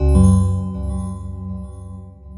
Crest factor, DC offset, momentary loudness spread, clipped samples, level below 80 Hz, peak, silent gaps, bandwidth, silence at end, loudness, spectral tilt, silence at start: 16 dB; under 0.1%; 22 LU; under 0.1%; -24 dBFS; -2 dBFS; none; 11 kHz; 0 s; -19 LUFS; -9 dB/octave; 0 s